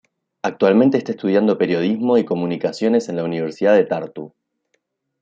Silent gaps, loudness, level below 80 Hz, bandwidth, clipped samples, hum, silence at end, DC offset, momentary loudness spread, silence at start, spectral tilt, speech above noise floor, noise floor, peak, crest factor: none; -18 LUFS; -66 dBFS; 7.8 kHz; under 0.1%; none; 0.95 s; under 0.1%; 11 LU; 0.45 s; -7 dB/octave; 52 dB; -70 dBFS; -2 dBFS; 16 dB